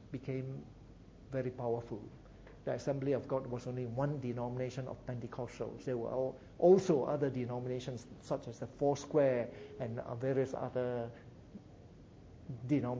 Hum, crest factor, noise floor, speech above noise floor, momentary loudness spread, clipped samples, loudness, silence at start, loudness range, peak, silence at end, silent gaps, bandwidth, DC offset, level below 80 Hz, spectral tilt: none; 20 dB; -56 dBFS; 20 dB; 22 LU; under 0.1%; -37 LUFS; 0 s; 6 LU; -16 dBFS; 0 s; none; 7.8 kHz; under 0.1%; -62 dBFS; -7.5 dB/octave